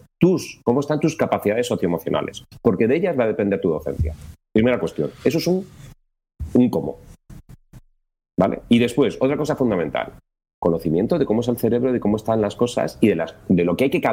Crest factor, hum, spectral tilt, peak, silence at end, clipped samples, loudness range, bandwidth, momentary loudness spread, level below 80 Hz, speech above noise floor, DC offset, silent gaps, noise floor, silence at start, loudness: 18 dB; none; -7 dB/octave; -4 dBFS; 0 s; under 0.1%; 3 LU; 16.5 kHz; 7 LU; -42 dBFS; 29 dB; under 0.1%; 10.54-10.62 s; -49 dBFS; 0.2 s; -21 LUFS